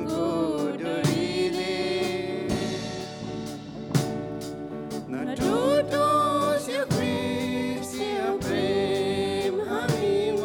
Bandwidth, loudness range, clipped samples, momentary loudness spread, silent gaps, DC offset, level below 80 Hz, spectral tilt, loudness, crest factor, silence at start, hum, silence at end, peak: 19 kHz; 5 LU; under 0.1%; 12 LU; none; under 0.1%; -54 dBFS; -5.5 dB/octave; -27 LUFS; 16 dB; 0 s; none; 0 s; -10 dBFS